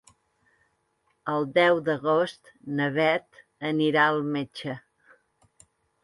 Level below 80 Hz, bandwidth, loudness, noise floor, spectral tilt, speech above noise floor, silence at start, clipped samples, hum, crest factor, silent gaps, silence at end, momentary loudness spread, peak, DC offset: -72 dBFS; 11.5 kHz; -25 LUFS; -72 dBFS; -6.5 dB/octave; 47 dB; 1.25 s; under 0.1%; none; 20 dB; none; 1.25 s; 15 LU; -8 dBFS; under 0.1%